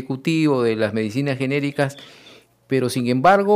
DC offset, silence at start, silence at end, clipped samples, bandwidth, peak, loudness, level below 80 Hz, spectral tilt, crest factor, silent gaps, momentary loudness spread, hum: under 0.1%; 0 s; 0 s; under 0.1%; 15.5 kHz; -4 dBFS; -20 LUFS; -62 dBFS; -6.5 dB/octave; 16 dB; none; 8 LU; none